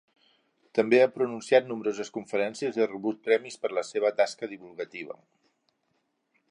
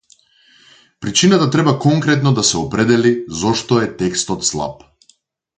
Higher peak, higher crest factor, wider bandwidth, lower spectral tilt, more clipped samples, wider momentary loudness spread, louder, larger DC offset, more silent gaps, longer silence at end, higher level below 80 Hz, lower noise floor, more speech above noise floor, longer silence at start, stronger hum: second, -8 dBFS vs 0 dBFS; first, 22 dB vs 16 dB; about the same, 10.5 kHz vs 9.6 kHz; about the same, -4.5 dB/octave vs -4.5 dB/octave; neither; first, 16 LU vs 7 LU; second, -27 LUFS vs -15 LUFS; neither; neither; first, 1.4 s vs 0.85 s; second, -78 dBFS vs -48 dBFS; first, -76 dBFS vs -57 dBFS; first, 48 dB vs 41 dB; second, 0.75 s vs 1 s; neither